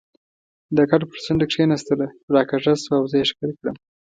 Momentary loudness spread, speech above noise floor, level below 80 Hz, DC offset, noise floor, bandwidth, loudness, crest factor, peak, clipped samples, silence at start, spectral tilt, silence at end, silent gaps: 9 LU; over 70 dB; -54 dBFS; under 0.1%; under -90 dBFS; 9.2 kHz; -21 LUFS; 20 dB; -2 dBFS; under 0.1%; 0.7 s; -6 dB/octave; 0.4 s; 2.23-2.28 s